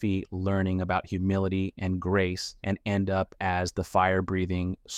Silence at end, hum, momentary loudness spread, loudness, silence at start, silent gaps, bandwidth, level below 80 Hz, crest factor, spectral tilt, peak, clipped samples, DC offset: 0 s; none; 5 LU; -28 LUFS; 0 s; none; 12.5 kHz; -52 dBFS; 18 dB; -6.5 dB/octave; -10 dBFS; under 0.1%; under 0.1%